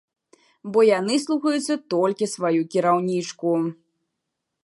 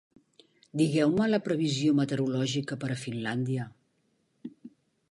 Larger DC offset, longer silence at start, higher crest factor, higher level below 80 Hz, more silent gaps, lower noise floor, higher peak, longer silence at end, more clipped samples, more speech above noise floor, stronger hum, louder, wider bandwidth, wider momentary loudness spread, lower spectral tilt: neither; about the same, 0.65 s vs 0.75 s; about the same, 16 dB vs 16 dB; second, -78 dBFS vs -70 dBFS; neither; first, -81 dBFS vs -73 dBFS; first, -6 dBFS vs -14 dBFS; first, 0.9 s vs 0.45 s; neither; first, 59 dB vs 45 dB; neither; first, -22 LUFS vs -28 LUFS; about the same, 11.5 kHz vs 11.5 kHz; second, 7 LU vs 20 LU; about the same, -5 dB/octave vs -6 dB/octave